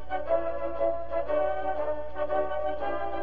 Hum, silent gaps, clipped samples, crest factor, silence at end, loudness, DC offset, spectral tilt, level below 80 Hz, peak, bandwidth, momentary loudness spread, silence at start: 60 Hz at -50 dBFS; none; under 0.1%; 14 dB; 0 s; -30 LUFS; 3%; -8 dB/octave; -48 dBFS; -14 dBFS; 4.9 kHz; 4 LU; 0 s